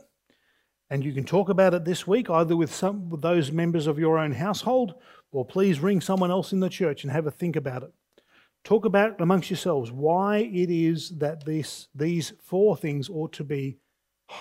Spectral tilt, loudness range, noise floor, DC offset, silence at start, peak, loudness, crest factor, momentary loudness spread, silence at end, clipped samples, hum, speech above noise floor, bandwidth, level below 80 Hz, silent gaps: -6.5 dB/octave; 3 LU; -70 dBFS; under 0.1%; 0.9 s; -6 dBFS; -25 LUFS; 18 dB; 9 LU; 0 s; under 0.1%; none; 46 dB; 16 kHz; -70 dBFS; none